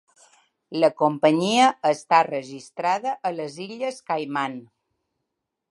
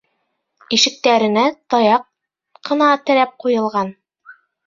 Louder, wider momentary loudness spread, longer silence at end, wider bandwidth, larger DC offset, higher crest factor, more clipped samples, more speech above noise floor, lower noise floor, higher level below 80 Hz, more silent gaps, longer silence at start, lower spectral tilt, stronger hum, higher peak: second, -23 LUFS vs -16 LUFS; first, 13 LU vs 9 LU; first, 1.1 s vs 0.35 s; first, 11.5 kHz vs 7.6 kHz; neither; about the same, 20 dB vs 18 dB; neither; about the same, 58 dB vs 55 dB; first, -81 dBFS vs -71 dBFS; second, -78 dBFS vs -64 dBFS; neither; about the same, 0.7 s vs 0.7 s; first, -4.5 dB/octave vs -3 dB/octave; neither; second, -4 dBFS vs 0 dBFS